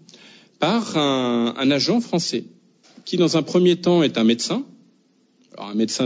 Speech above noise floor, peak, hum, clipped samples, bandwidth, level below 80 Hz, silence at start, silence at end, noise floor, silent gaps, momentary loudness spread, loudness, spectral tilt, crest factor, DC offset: 41 dB; -6 dBFS; none; under 0.1%; 8 kHz; -72 dBFS; 0.6 s; 0 s; -60 dBFS; none; 11 LU; -20 LUFS; -5 dB/octave; 16 dB; under 0.1%